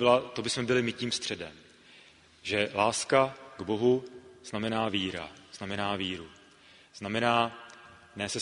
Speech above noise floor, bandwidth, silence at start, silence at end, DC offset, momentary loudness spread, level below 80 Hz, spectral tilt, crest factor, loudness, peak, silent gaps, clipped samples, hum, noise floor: 28 dB; 10.5 kHz; 0 s; 0 s; under 0.1%; 18 LU; -64 dBFS; -4 dB/octave; 24 dB; -30 LUFS; -8 dBFS; none; under 0.1%; none; -57 dBFS